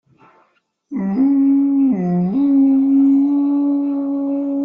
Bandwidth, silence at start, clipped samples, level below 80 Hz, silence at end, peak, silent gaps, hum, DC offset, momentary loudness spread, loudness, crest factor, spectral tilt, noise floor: 2.7 kHz; 0.9 s; under 0.1%; -62 dBFS; 0 s; -8 dBFS; none; none; under 0.1%; 7 LU; -16 LUFS; 8 dB; -12 dB/octave; -60 dBFS